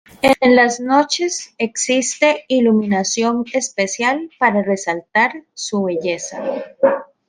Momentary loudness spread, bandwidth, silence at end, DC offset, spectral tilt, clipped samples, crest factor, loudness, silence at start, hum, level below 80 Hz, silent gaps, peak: 9 LU; 14 kHz; 0.25 s; under 0.1%; -3.5 dB/octave; under 0.1%; 16 dB; -17 LUFS; 0.25 s; none; -58 dBFS; none; 0 dBFS